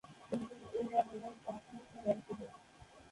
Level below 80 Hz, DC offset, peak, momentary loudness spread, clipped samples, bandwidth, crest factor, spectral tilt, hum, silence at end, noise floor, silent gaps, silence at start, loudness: -72 dBFS; under 0.1%; -20 dBFS; 19 LU; under 0.1%; 11.5 kHz; 22 dB; -6.5 dB/octave; none; 0 s; -60 dBFS; none; 0.05 s; -41 LUFS